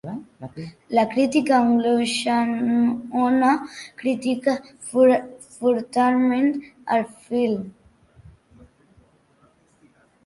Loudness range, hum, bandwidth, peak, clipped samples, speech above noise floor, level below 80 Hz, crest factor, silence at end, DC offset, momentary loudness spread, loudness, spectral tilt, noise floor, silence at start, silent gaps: 8 LU; none; 11.5 kHz; -6 dBFS; under 0.1%; 38 dB; -62 dBFS; 16 dB; 2.55 s; under 0.1%; 17 LU; -21 LUFS; -5 dB/octave; -59 dBFS; 0.05 s; none